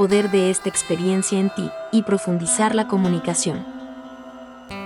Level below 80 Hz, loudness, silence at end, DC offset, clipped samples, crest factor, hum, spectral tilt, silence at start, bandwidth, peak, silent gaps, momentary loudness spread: -58 dBFS; -20 LUFS; 0 s; under 0.1%; under 0.1%; 14 dB; none; -4.5 dB/octave; 0 s; 12 kHz; -6 dBFS; none; 19 LU